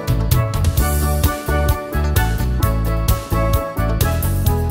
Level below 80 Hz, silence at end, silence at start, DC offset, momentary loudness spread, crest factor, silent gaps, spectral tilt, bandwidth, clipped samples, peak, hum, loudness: -20 dBFS; 0 s; 0 s; under 0.1%; 2 LU; 16 dB; none; -5.5 dB/octave; 16.5 kHz; under 0.1%; -2 dBFS; none; -18 LUFS